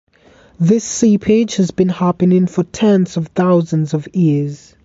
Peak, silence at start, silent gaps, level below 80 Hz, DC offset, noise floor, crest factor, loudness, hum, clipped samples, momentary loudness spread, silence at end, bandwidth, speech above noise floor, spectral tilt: -2 dBFS; 0.6 s; none; -50 dBFS; under 0.1%; -47 dBFS; 12 dB; -15 LUFS; none; under 0.1%; 5 LU; 0.3 s; 8 kHz; 33 dB; -7 dB/octave